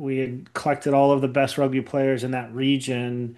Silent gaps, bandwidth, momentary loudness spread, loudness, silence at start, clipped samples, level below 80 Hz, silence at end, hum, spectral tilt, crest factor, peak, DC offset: none; 12.5 kHz; 9 LU; -23 LUFS; 0 s; under 0.1%; -66 dBFS; 0.05 s; none; -6 dB/octave; 16 dB; -6 dBFS; under 0.1%